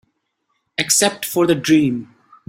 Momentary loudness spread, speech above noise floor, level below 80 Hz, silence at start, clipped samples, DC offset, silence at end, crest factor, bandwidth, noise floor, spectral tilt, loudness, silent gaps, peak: 11 LU; 54 dB; -58 dBFS; 0.8 s; under 0.1%; under 0.1%; 0.45 s; 18 dB; 16.5 kHz; -70 dBFS; -3 dB/octave; -16 LUFS; none; 0 dBFS